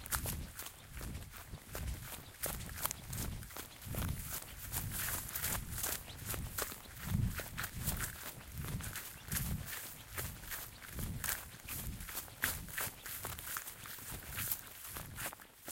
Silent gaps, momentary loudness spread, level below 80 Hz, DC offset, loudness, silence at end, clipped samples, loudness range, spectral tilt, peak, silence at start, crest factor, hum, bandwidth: none; 9 LU; -50 dBFS; under 0.1%; -41 LUFS; 0 s; under 0.1%; 3 LU; -3 dB/octave; -12 dBFS; 0 s; 32 dB; none; 17 kHz